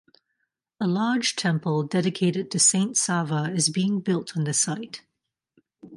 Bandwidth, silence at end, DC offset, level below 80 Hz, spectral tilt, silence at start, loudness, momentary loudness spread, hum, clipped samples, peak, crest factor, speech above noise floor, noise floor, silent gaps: 11.5 kHz; 0 s; under 0.1%; -72 dBFS; -3.5 dB/octave; 0.8 s; -23 LUFS; 8 LU; none; under 0.1%; -6 dBFS; 18 dB; 58 dB; -82 dBFS; none